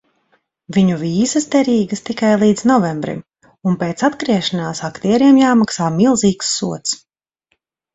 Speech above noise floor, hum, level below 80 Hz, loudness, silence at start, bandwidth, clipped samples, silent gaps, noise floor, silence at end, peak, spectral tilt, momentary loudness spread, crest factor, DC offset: 53 dB; none; -54 dBFS; -16 LUFS; 0.7 s; 8.4 kHz; under 0.1%; none; -68 dBFS; 0.95 s; 0 dBFS; -5 dB/octave; 11 LU; 16 dB; under 0.1%